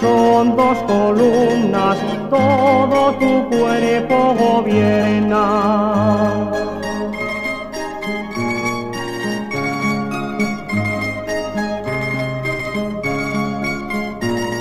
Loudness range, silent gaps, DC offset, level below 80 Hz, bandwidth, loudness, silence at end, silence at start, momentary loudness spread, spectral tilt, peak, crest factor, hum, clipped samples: 7 LU; none; under 0.1%; -44 dBFS; 15.5 kHz; -17 LUFS; 0 s; 0 s; 9 LU; -6.5 dB/octave; -2 dBFS; 14 dB; none; under 0.1%